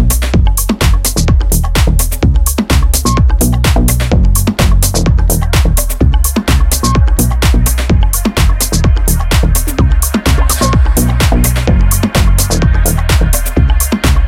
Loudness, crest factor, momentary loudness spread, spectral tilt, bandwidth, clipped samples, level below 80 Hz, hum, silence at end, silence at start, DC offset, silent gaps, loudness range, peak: -11 LUFS; 8 dB; 2 LU; -4.5 dB/octave; 17 kHz; under 0.1%; -10 dBFS; none; 0 s; 0 s; under 0.1%; none; 1 LU; 0 dBFS